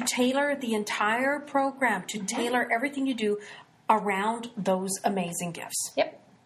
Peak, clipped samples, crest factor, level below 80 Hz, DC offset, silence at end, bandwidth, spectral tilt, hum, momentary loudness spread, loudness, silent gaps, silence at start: -8 dBFS; under 0.1%; 20 dB; -74 dBFS; under 0.1%; 0.3 s; 14.5 kHz; -3.5 dB/octave; none; 7 LU; -28 LUFS; none; 0 s